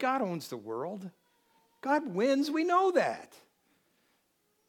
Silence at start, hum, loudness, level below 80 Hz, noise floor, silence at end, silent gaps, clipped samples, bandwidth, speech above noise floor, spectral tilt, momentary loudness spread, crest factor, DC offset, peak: 0 s; none; -30 LUFS; under -90 dBFS; -75 dBFS; 1.45 s; none; under 0.1%; 17.5 kHz; 44 dB; -5.5 dB/octave; 15 LU; 20 dB; under 0.1%; -14 dBFS